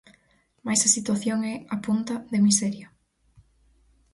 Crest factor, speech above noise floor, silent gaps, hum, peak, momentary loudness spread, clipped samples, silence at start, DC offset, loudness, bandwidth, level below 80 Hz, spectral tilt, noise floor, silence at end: 20 dB; 40 dB; none; none; -6 dBFS; 12 LU; under 0.1%; 0.65 s; under 0.1%; -23 LUFS; 11.5 kHz; -64 dBFS; -3.5 dB/octave; -64 dBFS; 1.25 s